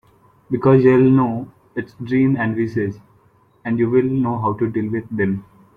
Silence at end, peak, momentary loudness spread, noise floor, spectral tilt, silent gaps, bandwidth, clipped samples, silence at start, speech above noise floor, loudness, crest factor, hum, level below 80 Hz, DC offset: 0.35 s; -2 dBFS; 16 LU; -55 dBFS; -10.5 dB/octave; none; 5 kHz; under 0.1%; 0.5 s; 38 dB; -18 LUFS; 16 dB; none; -54 dBFS; under 0.1%